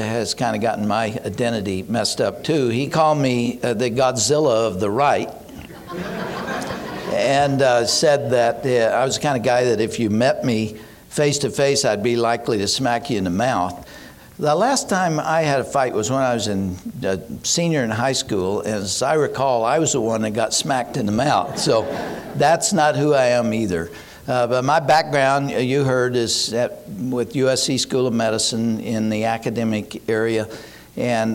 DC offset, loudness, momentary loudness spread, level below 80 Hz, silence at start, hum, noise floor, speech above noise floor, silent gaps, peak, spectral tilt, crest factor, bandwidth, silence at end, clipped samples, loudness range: under 0.1%; -20 LUFS; 10 LU; -52 dBFS; 0 s; none; -41 dBFS; 22 dB; none; -6 dBFS; -4 dB/octave; 14 dB; 17 kHz; 0 s; under 0.1%; 3 LU